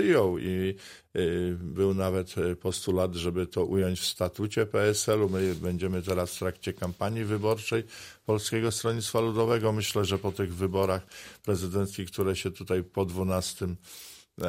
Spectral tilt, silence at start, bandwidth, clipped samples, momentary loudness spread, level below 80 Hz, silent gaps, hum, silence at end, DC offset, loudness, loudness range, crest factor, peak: -5 dB/octave; 0 s; 16 kHz; under 0.1%; 8 LU; -54 dBFS; none; none; 0 s; under 0.1%; -29 LUFS; 3 LU; 16 dB; -12 dBFS